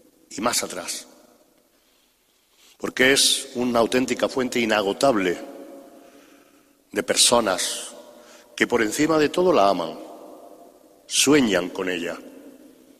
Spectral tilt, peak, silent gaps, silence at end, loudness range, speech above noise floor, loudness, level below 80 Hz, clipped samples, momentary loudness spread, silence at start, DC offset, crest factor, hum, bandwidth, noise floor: -2.5 dB/octave; -2 dBFS; none; 0.5 s; 3 LU; 42 dB; -21 LUFS; -58 dBFS; under 0.1%; 18 LU; 0.3 s; under 0.1%; 20 dB; none; 15.5 kHz; -63 dBFS